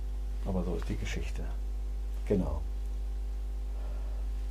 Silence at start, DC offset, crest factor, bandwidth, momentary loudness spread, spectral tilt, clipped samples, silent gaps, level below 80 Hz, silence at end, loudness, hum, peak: 0 s; under 0.1%; 16 dB; 10 kHz; 7 LU; -7 dB/octave; under 0.1%; none; -34 dBFS; 0 s; -36 LUFS; none; -16 dBFS